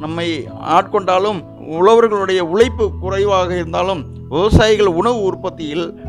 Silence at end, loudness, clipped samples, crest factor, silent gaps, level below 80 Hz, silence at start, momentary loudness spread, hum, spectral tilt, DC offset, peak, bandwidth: 0 s; -15 LUFS; under 0.1%; 14 dB; none; -34 dBFS; 0 s; 11 LU; none; -6 dB/octave; under 0.1%; 0 dBFS; 11.5 kHz